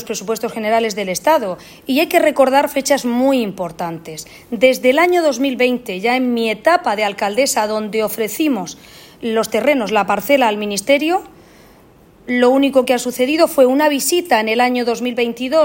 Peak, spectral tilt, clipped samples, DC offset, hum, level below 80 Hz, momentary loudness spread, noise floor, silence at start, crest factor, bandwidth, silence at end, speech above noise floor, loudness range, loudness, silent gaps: 0 dBFS; -3.5 dB/octave; under 0.1%; under 0.1%; none; -56 dBFS; 10 LU; -46 dBFS; 0 s; 16 dB; 16.5 kHz; 0 s; 31 dB; 3 LU; -16 LUFS; none